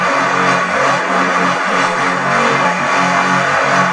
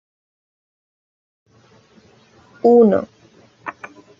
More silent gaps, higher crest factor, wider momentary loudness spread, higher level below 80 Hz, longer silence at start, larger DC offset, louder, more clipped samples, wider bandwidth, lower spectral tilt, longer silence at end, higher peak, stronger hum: neither; about the same, 14 dB vs 18 dB; second, 2 LU vs 24 LU; about the same, -64 dBFS vs -68 dBFS; second, 0 s vs 2.65 s; neither; about the same, -13 LUFS vs -14 LUFS; neither; first, 11 kHz vs 6.6 kHz; second, -4 dB/octave vs -9 dB/octave; second, 0 s vs 0.35 s; about the same, 0 dBFS vs -2 dBFS; neither